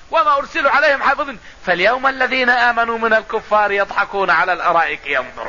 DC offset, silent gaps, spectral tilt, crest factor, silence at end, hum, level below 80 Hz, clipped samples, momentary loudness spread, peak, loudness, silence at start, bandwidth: 0.6%; none; -3.5 dB/octave; 14 dB; 0 s; none; -48 dBFS; under 0.1%; 7 LU; -2 dBFS; -15 LUFS; 0.1 s; 7.4 kHz